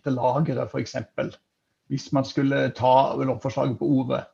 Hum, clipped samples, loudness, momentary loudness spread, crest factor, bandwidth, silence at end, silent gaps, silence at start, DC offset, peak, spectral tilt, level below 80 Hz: none; under 0.1%; -24 LUFS; 12 LU; 18 dB; 7.4 kHz; 0.1 s; none; 0.05 s; under 0.1%; -6 dBFS; -7 dB/octave; -62 dBFS